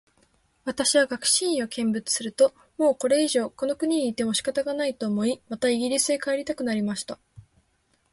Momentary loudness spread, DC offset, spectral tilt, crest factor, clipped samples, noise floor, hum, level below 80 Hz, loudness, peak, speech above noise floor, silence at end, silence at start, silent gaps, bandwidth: 7 LU; under 0.1%; -3 dB/octave; 18 dB; under 0.1%; -68 dBFS; none; -64 dBFS; -24 LUFS; -8 dBFS; 44 dB; 0.7 s; 0.65 s; none; 12 kHz